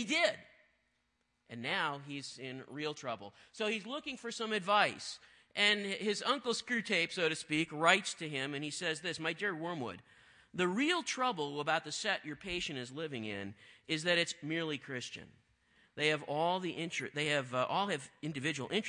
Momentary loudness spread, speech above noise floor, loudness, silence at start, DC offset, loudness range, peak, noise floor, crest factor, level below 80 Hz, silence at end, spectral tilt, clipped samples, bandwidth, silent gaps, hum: 14 LU; 44 dB; -35 LUFS; 0 s; under 0.1%; 5 LU; -10 dBFS; -80 dBFS; 26 dB; -74 dBFS; 0 s; -3.5 dB/octave; under 0.1%; 10.5 kHz; none; none